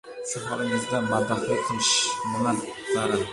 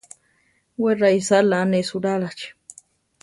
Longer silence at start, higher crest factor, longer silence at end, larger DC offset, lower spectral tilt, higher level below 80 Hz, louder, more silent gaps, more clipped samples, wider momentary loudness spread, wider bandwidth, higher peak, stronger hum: second, 0.05 s vs 0.8 s; about the same, 16 dB vs 16 dB; second, 0 s vs 0.7 s; neither; second, -3 dB/octave vs -5 dB/octave; first, -58 dBFS vs -66 dBFS; second, -25 LUFS vs -20 LUFS; neither; neither; second, 9 LU vs 18 LU; about the same, 11.5 kHz vs 11.5 kHz; second, -10 dBFS vs -6 dBFS; neither